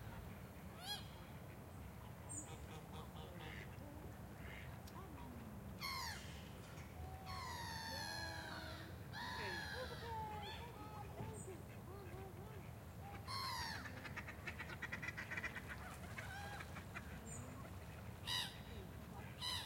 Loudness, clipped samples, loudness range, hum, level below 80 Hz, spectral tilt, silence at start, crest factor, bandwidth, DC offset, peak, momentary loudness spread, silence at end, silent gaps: -50 LUFS; under 0.1%; 5 LU; none; -62 dBFS; -3.5 dB/octave; 0 s; 20 dB; 16.5 kHz; under 0.1%; -30 dBFS; 9 LU; 0 s; none